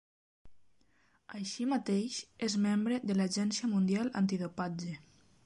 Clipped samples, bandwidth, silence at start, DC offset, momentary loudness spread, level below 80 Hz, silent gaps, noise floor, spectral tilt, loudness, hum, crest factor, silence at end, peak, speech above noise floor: under 0.1%; 11.5 kHz; 0.45 s; under 0.1%; 11 LU; -72 dBFS; none; -71 dBFS; -5.5 dB/octave; -33 LUFS; none; 14 dB; 0.45 s; -20 dBFS; 38 dB